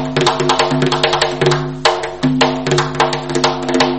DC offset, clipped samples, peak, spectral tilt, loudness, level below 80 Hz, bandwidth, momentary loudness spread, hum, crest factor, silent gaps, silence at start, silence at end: 0.9%; under 0.1%; 0 dBFS; -4.5 dB/octave; -15 LUFS; -42 dBFS; 8.8 kHz; 2 LU; none; 16 dB; none; 0 s; 0 s